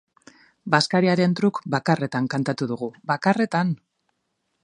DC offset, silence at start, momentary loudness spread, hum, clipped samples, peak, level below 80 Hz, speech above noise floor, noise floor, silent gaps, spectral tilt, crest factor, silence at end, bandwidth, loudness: under 0.1%; 0.65 s; 8 LU; none; under 0.1%; -2 dBFS; -68 dBFS; 53 dB; -75 dBFS; none; -6 dB/octave; 22 dB; 0.9 s; 10.5 kHz; -22 LUFS